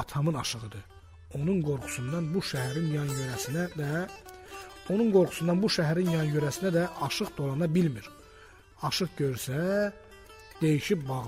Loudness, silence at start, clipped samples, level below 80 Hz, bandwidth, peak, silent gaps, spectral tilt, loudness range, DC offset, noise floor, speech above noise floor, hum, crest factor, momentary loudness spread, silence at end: -29 LUFS; 0 s; under 0.1%; -56 dBFS; 16 kHz; -12 dBFS; none; -5.5 dB/octave; 4 LU; under 0.1%; -53 dBFS; 25 dB; none; 18 dB; 16 LU; 0 s